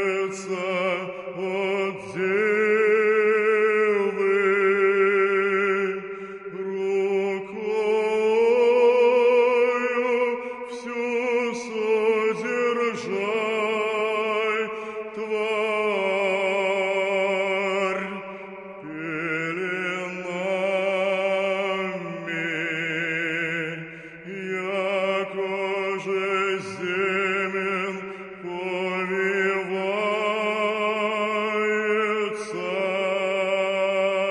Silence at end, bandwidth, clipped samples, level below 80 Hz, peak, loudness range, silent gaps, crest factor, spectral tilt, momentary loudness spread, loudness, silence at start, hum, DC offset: 0 s; 11 kHz; under 0.1%; -70 dBFS; -8 dBFS; 6 LU; none; 14 dB; -5 dB/octave; 11 LU; -24 LUFS; 0 s; none; under 0.1%